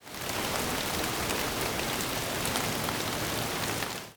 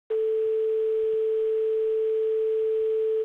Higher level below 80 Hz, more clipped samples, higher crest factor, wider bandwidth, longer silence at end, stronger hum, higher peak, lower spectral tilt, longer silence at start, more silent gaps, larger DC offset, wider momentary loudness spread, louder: first, -50 dBFS vs -70 dBFS; neither; first, 20 dB vs 4 dB; first, over 20 kHz vs 3.8 kHz; about the same, 0 s vs 0 s; neither; first, -10 dBFS vs -20 dBFS; second, -2.5 dB/octave vs -5 dB/octave; about the same, 0 s vs 0.1 s; neither; neither; about the same, 2 LU vs 0 LU; second, -30 LUFS vs -25 LUFS